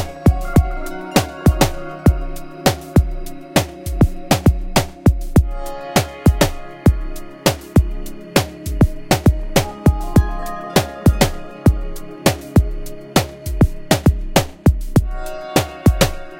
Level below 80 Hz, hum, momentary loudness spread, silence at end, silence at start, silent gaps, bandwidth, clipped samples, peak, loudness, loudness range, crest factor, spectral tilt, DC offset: -22 dBFS; none; 11 LU; 0 s; 0 s; none; 17 kHz; under 0.1%; 0 dBFS; -18 LUFS; 1 LU; 16 dB; -5.5 dB/octave; under 0.1%